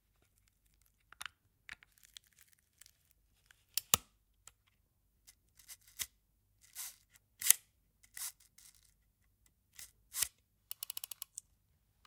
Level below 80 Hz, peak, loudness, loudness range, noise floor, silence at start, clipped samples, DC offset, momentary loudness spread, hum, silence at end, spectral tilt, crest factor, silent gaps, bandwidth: -74 dBFS; 0 dBFS; -37 LUFS; 13 LU; -76 dBFS; 1.2 s; under 0.1%; under 0.1%; 28 LU; none; 1.8 s; 1 dB/octave; 44 dB; none; 18 kHz